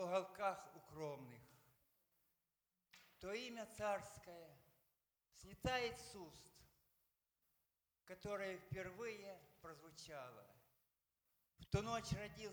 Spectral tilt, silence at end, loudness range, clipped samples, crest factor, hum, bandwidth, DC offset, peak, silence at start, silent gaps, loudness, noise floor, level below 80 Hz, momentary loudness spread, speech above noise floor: -4.5 dB/octave; 0 s; 5 LU; under 0.1%; 24 dB; none; over 20 kHz; under 0.1%; -26 dBFS; 0 s; none; -48 LUFS; under -90 dBFS; -68 dBFS; 21 LU; over 41 dB